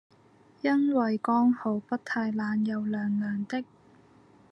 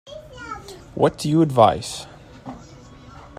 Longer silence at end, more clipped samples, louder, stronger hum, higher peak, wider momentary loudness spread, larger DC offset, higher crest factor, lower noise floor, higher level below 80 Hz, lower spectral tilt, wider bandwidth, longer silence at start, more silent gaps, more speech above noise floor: first, 0.9 s vs 0.15 s; neither; second, -28 LUFS vs -19 LUFS; neither; second, -14 dBFS vs -2 dBFS; second, 8 LU vs 24 LU; neither; second, 16 dB vs 22 dB; first, -59 dBFS vs -43 dBFS; second, -80 dBFS vs -50 dBFS; first, -7.5 dB/octave vs -6 dB/octave; second, 7.8 kHz vs 15 kHz; first, 0.65 s vs 0.05 s; neither; first, 32 dB vs 25 dB